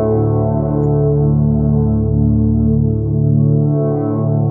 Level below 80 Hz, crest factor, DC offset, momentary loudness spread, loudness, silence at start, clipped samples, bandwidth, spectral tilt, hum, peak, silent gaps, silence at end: -28 dBFS; 10 dB; under 0.1%; 2 LU; -14 LUFS; 0 s; under 0.1%; 1.6 kHz; -16 dB/octave; none; -4 dBFS; none; 0 s